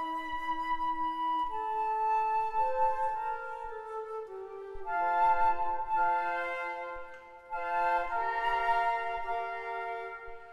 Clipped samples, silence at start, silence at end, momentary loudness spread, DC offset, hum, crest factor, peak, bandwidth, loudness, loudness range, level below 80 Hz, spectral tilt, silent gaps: under 0.1%; 0 s; 0 s; 13 LU; under 0.1%; none; 16 dB; -16 dBFS; 11.5 kHz; -32 LUFS; 1 LU; -56 dBFS; -4 dB/octave; none